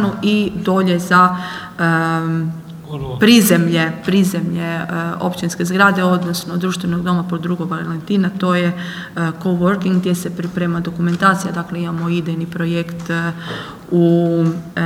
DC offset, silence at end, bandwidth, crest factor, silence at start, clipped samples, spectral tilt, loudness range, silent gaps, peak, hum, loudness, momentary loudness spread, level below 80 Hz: under 0.1%; 0 s; 16.5 kHz; 16 dB; 0 s; under 0.1%; -5.5 dB/octave; 4 LU; none; 0 dBFS; none; -17 LUFS; 11 LU; -50 dBFS